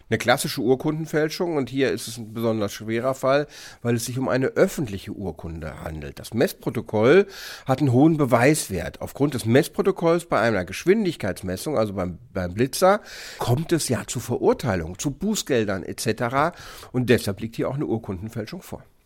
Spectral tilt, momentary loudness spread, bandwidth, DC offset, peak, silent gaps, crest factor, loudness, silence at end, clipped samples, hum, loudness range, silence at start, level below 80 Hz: -5.5 dB/octave; 14 LU; 17 kHz; under 0.1%; -4 dBFS; none; 20 dB; -23 LUFS; 0.3 s; under 0.1%; none; 4 LU; 0.1 s; -48 dBFS